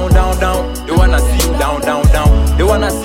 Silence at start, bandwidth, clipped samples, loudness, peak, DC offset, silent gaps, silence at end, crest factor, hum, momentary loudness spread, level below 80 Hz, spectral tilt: 0 s; 16.5 kHz; under 0.1%; -13 LUFS; 0 dBFS; under 0.1%; none; 0 s; 10 dB; none; 4 LU; -12 dBFS; -5.5 dB/octave